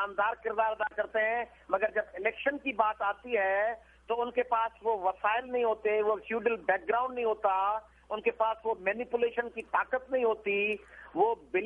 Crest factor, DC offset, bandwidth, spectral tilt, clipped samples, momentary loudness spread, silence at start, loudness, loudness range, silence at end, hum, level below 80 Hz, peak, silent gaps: 20 dB; under 0.1%; 3.8 kHz; -6 dB/octave; under 0.1%; 5 LU; 0 s; -31 LUFS; 1 LU; 0 s; none; -64 dBFS; -12 dBFS; none